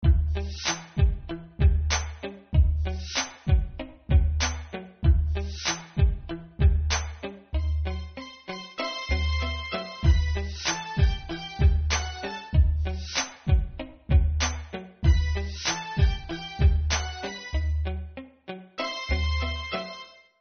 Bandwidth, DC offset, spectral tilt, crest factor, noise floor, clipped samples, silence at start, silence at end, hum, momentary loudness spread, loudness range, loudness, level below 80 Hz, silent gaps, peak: 6.6 kHz; under 0.1%; -4.5 dB/octave; 16 dB; -45 dBFS; under 0.1%; 0 s; 0.3 s; none; 13 LU; 3 LU; -27 LUFS; -28 dBFS; none; -10 dBFS